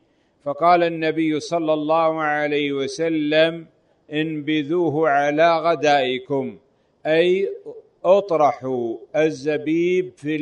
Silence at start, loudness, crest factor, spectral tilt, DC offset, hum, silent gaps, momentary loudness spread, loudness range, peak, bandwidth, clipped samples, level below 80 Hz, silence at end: 0.45 s; -20 LUFS; 16 dB; -5.5 dB/octave; under 0.1%; none; none; 9 LU; 2 LU; -4 dBFS; 9.8 kHz; under 0.1%; -68 dBFS; 0 s